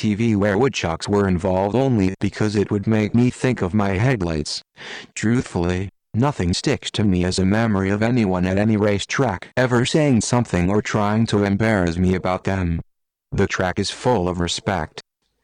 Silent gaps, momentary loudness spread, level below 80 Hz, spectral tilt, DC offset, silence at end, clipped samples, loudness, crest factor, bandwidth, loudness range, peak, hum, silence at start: none; 6 LU; -42 dBFS; -6 dB/octave; under 0.1%; 0.45 s; under 0.1%; -20 LUFS; 12 dB; 10.5 kHz; 3 LU; -8 dBFS; none; 0 s